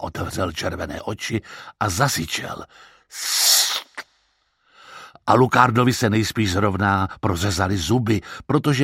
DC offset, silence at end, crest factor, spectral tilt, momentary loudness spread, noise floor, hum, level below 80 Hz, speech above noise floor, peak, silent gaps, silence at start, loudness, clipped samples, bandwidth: under 0.1%; 0 s; 22 dB; -4 dB/octave; 15 LU; -66 dBFS; none; -46 dBFS; 45 dB; 0 dBFS; none; 0 s; -20 LUFS; under 0.1%; 16.5 kHz